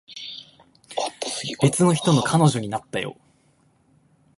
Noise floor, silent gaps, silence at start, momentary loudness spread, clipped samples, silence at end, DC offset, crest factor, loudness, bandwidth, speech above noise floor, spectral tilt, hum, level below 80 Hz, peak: -61 dBFS; none; 0.1 s; 17 LU; under 0.1%; 1.25 s; under 0.1%; 20 dB; -22 LUFS; 11.5 kHz; 41 dB; -5 dB/octave; none; -58 dBFS; -4 dBFS